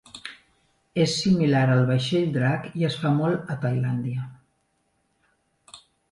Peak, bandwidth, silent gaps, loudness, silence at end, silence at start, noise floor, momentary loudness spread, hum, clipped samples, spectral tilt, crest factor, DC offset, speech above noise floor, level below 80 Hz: -8 dBFS; 11.5 kHz; none; -24 LUFS; 0.35 s; 0.15 s; -71 dBFS; 14 LU; none; under 0.1%; -6.5 dB/octave; 16 dB; under 0.1%; 48 dB; -62 dBFS